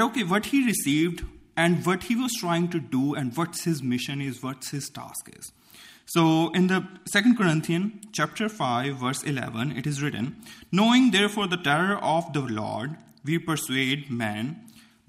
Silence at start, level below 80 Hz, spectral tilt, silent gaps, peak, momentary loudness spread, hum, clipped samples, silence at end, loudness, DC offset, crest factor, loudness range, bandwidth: 0 s; -56 dBFS; -5 dB/octave; none; -6 dBFS; 13 LU; none; under 0.1%; 0.3 s; -25 LUFS; under 0.1%; 18 dB; 5 LU; 15.5 kHz